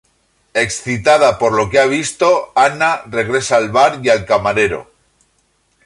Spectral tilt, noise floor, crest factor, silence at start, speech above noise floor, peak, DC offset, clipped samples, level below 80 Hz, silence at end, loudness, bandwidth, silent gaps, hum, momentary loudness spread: -4 dB/octave; -60 dBFS; 14 dB; 0.55 s; 47 dB; 0 dBFS; under 0.1%; under 0.1%; -46 dBFS; 1 s; -14 LUFS; 11.5 kHz; none; none; 6 LU